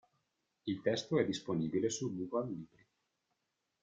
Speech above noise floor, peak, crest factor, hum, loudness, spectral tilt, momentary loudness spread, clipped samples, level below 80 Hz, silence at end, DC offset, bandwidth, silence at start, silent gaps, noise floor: 49 dB; -18 dBFS; 20 dB; none; -37 LUFS; -5 dB/octave; 12 LU; under 0.1%; -74 dBFS; 1.15 s; under 0.1%; 9.6 kHz; 0.65 s; none; -85 dBFS